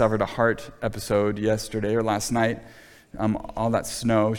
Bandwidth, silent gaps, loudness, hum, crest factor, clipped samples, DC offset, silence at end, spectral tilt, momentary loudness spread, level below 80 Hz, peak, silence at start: 18.5 kHz; none; -25 LUFS; none; 18 dB; under 0.1%; under 0.1%; 0 s; -5.5 dB/octave; 7 LU; -46 dBFS; -6 dBFS; 0 s